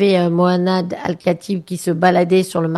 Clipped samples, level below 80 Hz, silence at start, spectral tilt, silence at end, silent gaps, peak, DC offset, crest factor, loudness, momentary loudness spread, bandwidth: under 0.1%; -58 dBFS; 0 s; -6.5 dB/octave; 0 s; none; -2 dBFS; under 0.1%; 14 dB; -17 LUFS; 8 LU; 12.5 kHz